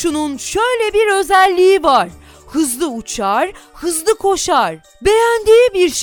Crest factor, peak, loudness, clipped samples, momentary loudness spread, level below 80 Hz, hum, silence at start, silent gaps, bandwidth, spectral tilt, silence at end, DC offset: 14 dB; 0 dBFS; -14 LUFS; under 0.1%; 10 LU; -42 dBFS; none; 0 s; none; 18 kHz; -2.5 dB/octave; 0 s; under 0.1%